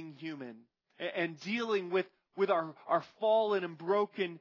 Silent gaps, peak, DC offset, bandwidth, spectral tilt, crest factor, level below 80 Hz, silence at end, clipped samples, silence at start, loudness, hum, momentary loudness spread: none; -18 dBFS; under 0.1%; 6 kHz; -6 dB/octave; 16 dB; under -90 dBFS; 0 s; under 0.1%; 0 s; -33 LUFS; none; 14 LU